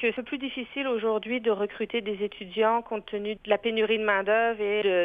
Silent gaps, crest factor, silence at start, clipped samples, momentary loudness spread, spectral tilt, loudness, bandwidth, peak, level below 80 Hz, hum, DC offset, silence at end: none; 18 dB; 0 s; under 0.1%; 9 LU; -7 dB/octave; -27 LUFS; 4.7 kHz; -8 dBFS; -62 dBFS; none; under 0.1%; 0 s